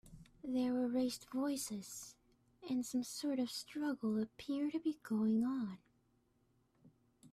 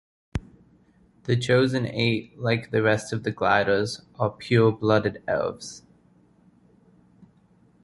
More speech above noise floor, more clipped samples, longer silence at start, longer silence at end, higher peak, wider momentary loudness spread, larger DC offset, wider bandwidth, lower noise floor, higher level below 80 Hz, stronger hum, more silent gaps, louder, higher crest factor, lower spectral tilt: about the same, 38 dB vs 36 dB; neither; second, 0.05 s vs 0.35 s; second, 0.05 s vs 2.05 s; second, -26 dBFS vs -4 dBFS; second, 12 LU vs 15 LU; neither; first, 15.5 kHz vs 11.5 kHz; first, -76 dBFS vs -59 dBFS; second, -74 dBFS vs -52 dBFS; neither; neither; second, -39 LUFS vs -24 LUFS; second, 14 dB vs 20 dB; second, -4.5 dB/octave vs -6 dB/octave